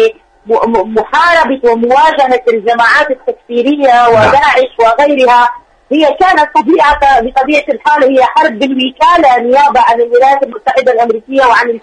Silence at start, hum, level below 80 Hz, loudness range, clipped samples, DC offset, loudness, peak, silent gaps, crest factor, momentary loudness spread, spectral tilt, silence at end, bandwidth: 0 s; none; -40 dBFS; 1 LU; under 0.1%; under 0.1%; -8 LUFS; 0 dBFS; none; 8 dB; 6 LU; -4.5 dB/octave; 0.05 s; 10.5 kHz